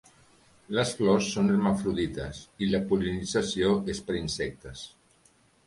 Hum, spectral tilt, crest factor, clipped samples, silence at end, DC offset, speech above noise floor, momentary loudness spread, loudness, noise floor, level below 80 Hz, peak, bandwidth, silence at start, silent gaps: none; -5.5 dB/octave; 18 dB; under 0.1%; 0.8 s; under 0.1%; 36 dB; 14 LU; -28 LUFS; -63 dBFS; -50 dBFS; -10 dBFS; 11.5 kHz; 0.7 s; none